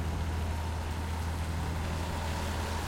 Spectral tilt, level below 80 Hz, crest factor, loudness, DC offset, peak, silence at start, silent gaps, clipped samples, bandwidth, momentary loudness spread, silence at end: -5.5 dB/octave; -40 dBFS; 10 dB; -35 LUFS; under 0.1%; -22 dBFS; 0 s; none; under 0.1%; 16.5 kHz; 1 LU; 0 s